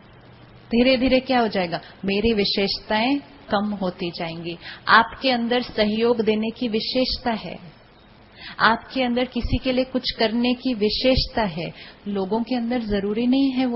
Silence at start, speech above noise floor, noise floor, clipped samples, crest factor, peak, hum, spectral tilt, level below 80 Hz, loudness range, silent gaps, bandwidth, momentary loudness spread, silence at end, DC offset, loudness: 0.55 s; 28 dB; -50 dBFS; under 0.1%; 22 dB; 0 dBFS; none; -9 dB/octave; -40 dBFS; 3 LU; none; 5.8 kHz; 11 LU; 0 s; under 0.1%; -22 LUFS